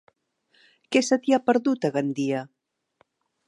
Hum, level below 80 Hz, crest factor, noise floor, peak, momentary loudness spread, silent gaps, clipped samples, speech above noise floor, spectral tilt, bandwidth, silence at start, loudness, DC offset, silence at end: none; -78 dBFS; 20 dB; -68 dBFS; -6 dBFS; 8 LU; none; under 0.1%; 45 dB; -5 dB/octave; 11.5 kHz; 0.9 s; -24 LUFS; under 0.1%; 1 s